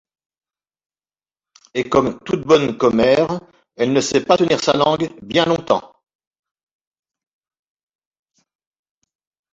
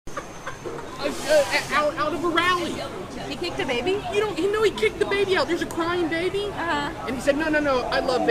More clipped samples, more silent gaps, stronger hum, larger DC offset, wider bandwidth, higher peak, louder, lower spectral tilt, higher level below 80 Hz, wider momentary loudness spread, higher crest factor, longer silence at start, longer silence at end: neither; neither; neither; neither; second, 8 kHz vs 15.5 kHz; first, -2 dBFS vs -6 dBFS; first, -17 LUFS vs -24 LUFS; about the same, -5 dB/octave vs -4 dB/octave; second, -54 dBFS vs -46 dBFS; second, 8 LU vs 12 LU; about the same, 18 dB vs 18 dB; first, 1.75 s vs 0.05 s; first, 3.7 s vs 0 s